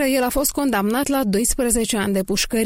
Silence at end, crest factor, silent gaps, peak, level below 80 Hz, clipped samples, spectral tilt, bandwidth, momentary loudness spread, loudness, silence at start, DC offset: 0 s; 14 dB; none; -6 dBFS; -36 dBFS; under 0.1%; -3.5 dB/octave; 16.5 kHz; 2 LU; -20 LUFS; 0 s; under 0.1%